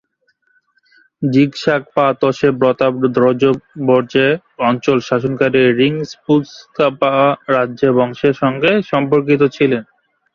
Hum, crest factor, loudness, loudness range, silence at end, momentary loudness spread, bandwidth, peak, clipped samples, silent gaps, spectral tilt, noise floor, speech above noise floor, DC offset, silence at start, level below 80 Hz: none; 14 dB; -15 LUFS; 1 LU; 0.5 s; 5 LU; 7.2 kHz; -2 dBFS; under 0.1%; none; -7 dB/octave; -62 dBFS; 48 dB; under 0.1%; 1.2 s; -56 dBFS